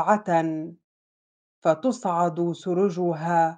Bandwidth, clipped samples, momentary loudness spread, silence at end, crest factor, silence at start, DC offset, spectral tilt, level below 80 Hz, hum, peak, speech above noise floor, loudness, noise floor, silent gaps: 9.4 kHz; under 0.1%; 7 LU; 0 s; 18 dB; 0 s; under 0.1%; -7 dB/octave; -76 dBFS; none; -6 dBFS; over 67 dB; -24 LUFS; under -90 dBFS; 0.84-1.62 s